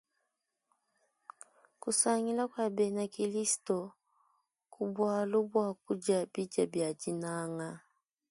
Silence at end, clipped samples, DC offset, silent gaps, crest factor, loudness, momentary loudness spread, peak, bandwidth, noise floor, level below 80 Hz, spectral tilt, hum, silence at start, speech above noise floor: 0.5 s; under 0.1%; under 0.1%; none; 22 dB; -33 LUFS; 12 LU; -14 dBFS; 11.5 kHz; -85 dBFS; -82 dBFS; -4 dB/octave; none; 1.85 s; 52 dB